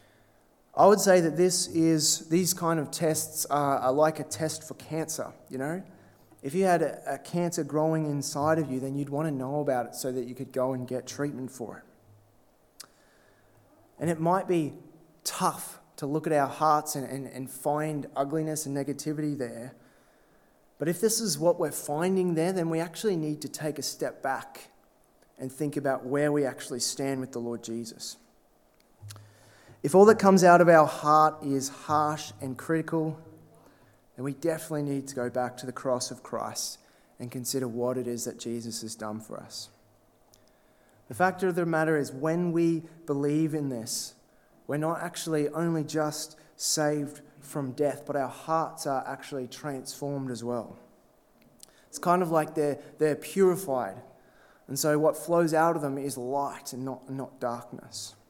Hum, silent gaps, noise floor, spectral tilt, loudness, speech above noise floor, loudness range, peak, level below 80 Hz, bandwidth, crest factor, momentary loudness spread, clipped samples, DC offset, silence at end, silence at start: none; none; -63 dBFS; -4.5 dB/octave; -28 LUFS; 36 dB; 10 LU; -4 dBFS; -72 dBFS; 18.5 kHz; 24 dB; 14 LU; under 0.1%; under 0.1%; 0.2 s; 0.75 s